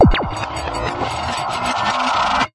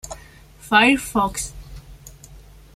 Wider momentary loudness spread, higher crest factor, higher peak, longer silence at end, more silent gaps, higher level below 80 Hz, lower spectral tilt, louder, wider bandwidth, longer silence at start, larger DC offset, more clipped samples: second, 7 LU vs 26 LU; about the same, 16 dB vs 20 dB; about the same, -2 dBFS vs -2 dBFS; second, 0.05 s vs 0.4 s; neither; first, -28 dBFS vs -42 dBFS; first, -5 dB/octave vs -3 dB/octave; about the same, -20 LUFS vs -18 LUFS; second, 11.5 kHz vs 16 kHz; about the same, 0 s vs 0.05 s; neither; neither